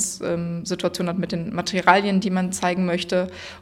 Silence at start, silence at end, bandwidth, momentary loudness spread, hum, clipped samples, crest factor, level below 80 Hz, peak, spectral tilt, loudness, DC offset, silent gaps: 0 s; 0 s; 15.5 kHz; 9 LU; none; under 0.1%; 22 dB; -56 dBFS; 0 dBFS; -4.5 dB/octave; -22 LUFS; under 0.1%; none